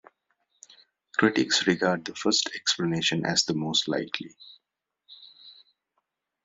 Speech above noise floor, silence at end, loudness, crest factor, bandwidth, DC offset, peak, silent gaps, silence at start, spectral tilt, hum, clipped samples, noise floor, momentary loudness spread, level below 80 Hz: 58 dB; 0.95 s; -25 LUFS; 22 dB; 8.2 kHz; under 0.1%; -6 dBFS; none; 1.2 s; -3 dB/octave; none; under 0.1%; -85 dBFS; 10 LU; -68 dBFS